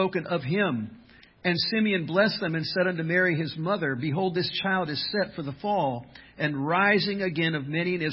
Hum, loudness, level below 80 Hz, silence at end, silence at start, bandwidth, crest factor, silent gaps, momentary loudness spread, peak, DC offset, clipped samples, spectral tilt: none; -26 LUFS; -62 dBFS; 0 s; 0 s; 5.8 kHz; 18 dB; none; 7 LU; -8 dBFS; under 0.1%; under 0.1%; -10 dB/octave